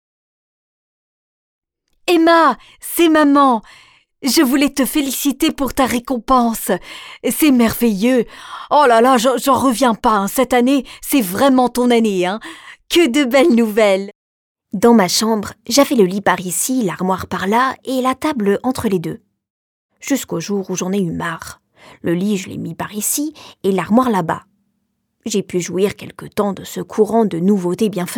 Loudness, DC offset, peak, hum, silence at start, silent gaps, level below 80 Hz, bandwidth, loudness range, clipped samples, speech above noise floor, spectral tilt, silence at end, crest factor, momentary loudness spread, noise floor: -16 LUFS; under 0.1%; -2 dBFS; none; 2.05 s; 14.15-14.55 s, 19.50-19.89 s; -48 dBFS; 19.5 kHz; 7 LU; under 0.1%; 54 dB; -4.5 dB/octave; 0 s; 16 dB; 13 LU; -69 dBFS